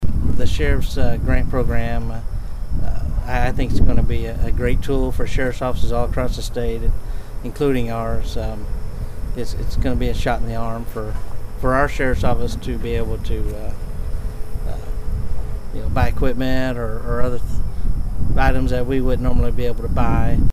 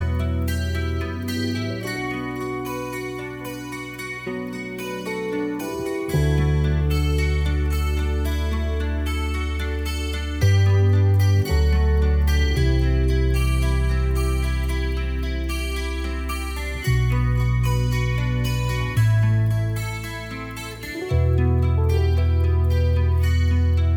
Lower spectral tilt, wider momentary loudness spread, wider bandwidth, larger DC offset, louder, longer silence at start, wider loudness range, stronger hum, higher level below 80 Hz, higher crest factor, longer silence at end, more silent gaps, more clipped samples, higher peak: about the same, -7 dB/octave vs -6.5 dB/octave; about the same, 11 LU vs 10 LU; second, 13 kHz vs 17.5 kHz; neither; about the same, -23 LUFS vs -23 LUFS; about the same, 0 s vs 0 s; second, 4 LU vs 8 LU; neither; about the same, -22 dBFS vs -26 dBFS; about the same, 14 dB vs 12 dB; about the same, 0 s vs 0 s; neither; neither; first, -2 dBFS vs -8 dBFS